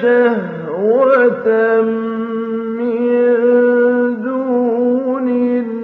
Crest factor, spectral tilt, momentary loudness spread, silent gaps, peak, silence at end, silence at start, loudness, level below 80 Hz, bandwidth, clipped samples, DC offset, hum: 12 dB; -9 dB/octave; 9 LU; none; -2 dBFS; 0 s; 0 s; -15 LUFS; -66 dBFS; 4.1 kHz; under 0.1%; under 0.1%; none